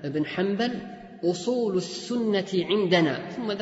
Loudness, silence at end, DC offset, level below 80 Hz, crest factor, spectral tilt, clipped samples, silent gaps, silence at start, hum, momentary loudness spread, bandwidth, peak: -26 LUFS; 0 s; under 0.1%; -66 dBFS; 16 dB; -5.5 dB/octave; under 0.1%; none; 0 s; none; 9 LU; 8 kHz; -10 dBFS